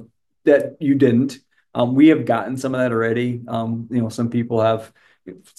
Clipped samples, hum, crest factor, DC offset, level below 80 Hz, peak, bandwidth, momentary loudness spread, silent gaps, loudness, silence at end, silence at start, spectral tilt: under 0.1%; none; 16 dB; under 0.1%; -64 dBFS; -2 dBFS; 12.5 kHz; 11 LU; none; -19 LUFS; 0.25 s; 0 s; -7.5 dB/octave